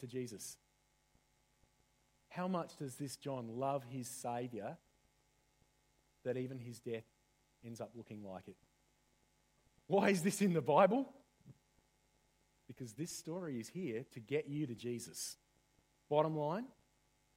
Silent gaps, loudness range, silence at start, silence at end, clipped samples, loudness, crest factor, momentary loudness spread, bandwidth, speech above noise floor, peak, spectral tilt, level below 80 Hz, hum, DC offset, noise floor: none; 12 LU; 0 s; 0.65 s; under 0.1%; -40 LUFS; 26 dB; 18 LU; 16 kHz; 37 dB; -16 dBFS; -5.5 dB/octave; -80 dBFS; none; under 0.1%; -76 dBFS